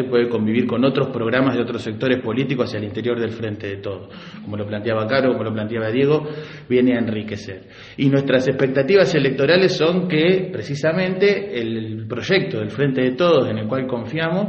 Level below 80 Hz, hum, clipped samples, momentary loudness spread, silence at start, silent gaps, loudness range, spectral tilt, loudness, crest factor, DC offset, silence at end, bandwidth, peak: -56 dBFS; none; under 0.1%; 12 LU; 0 s; none; 6 LU; -7 dB/octave; -19 LUFS; 18 dB; under 0.1%; 0 s; 8.2 kHz; -2 dBFS